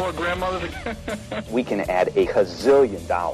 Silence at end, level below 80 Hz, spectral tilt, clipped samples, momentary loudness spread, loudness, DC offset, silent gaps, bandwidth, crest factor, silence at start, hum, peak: 0 s; -42 dBFS; -5.5 dB/octave; under 0.1%; 12 LU; -22 LUFS; under 0.1%; none; 14 kHz; 14 dB; 0 s; none; -8 dBFS